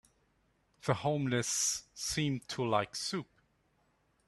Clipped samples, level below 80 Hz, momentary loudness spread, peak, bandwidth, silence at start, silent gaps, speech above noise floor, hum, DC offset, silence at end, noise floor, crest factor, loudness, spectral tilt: under 0.1%; -66 dBFS; 7 LU; -14 dBFS; 13 kHz; 0.85 s; none; 40 dB; none; under 0.1%; 1.05 s; -74 dBFS; 22 dB; -34 LUFS; -3.5 dB/octave